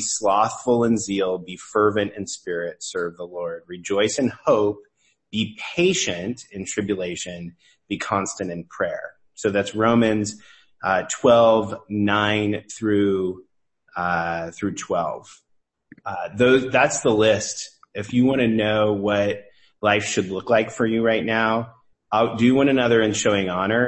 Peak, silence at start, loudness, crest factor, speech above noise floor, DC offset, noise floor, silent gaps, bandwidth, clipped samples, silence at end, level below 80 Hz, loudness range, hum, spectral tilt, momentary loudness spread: -4 dBFS; 0 s; -21 LUFS; 18 dB; 33 dB; under 0.1%; -54 dBFS; none; 8.8 kHz; under 0.1%; 0 s; -56 dBFS; 6 LU; none; -4.5 dB/octave; 13 LU